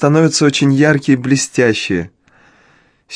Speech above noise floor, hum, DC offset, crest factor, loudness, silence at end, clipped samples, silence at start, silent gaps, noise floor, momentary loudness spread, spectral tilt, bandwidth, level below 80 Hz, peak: 40 dB; none; under 0.1%; 14 dB; -13 LUFS; 0 s; under 0.1%; 0 s; none; -52 dBFS; 8 LU; -5 dB/octave; 10.5 kHz; -52 dBFS; 0 dBFS